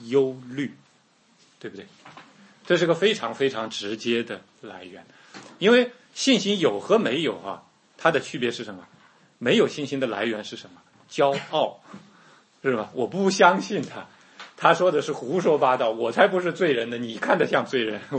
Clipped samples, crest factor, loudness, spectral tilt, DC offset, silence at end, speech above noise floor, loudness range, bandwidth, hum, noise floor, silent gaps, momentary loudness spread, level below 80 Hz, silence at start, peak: under 0.1%; 22 dB; -23 LUFS; -4.5 dB/octave; under 0.1%; 0 s; 37 dB; 5 LU; 8.8 kHz; none; -61 dBFS; none; 21 LU; -74 dBFS; 0 s; -2 dBFS